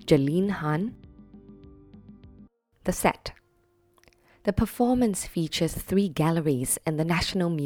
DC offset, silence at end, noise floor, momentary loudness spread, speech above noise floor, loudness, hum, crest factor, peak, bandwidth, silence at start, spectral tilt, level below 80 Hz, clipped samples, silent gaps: under 0.1%; 0 s; -66 dBFS; 8 LU; 41 dB; -26 LUFS; none; 20 dB; -6 dBFS; 19.5 kHz; 0 s; -5.5 dB/octave; -46 dBFS; under 0.1%; none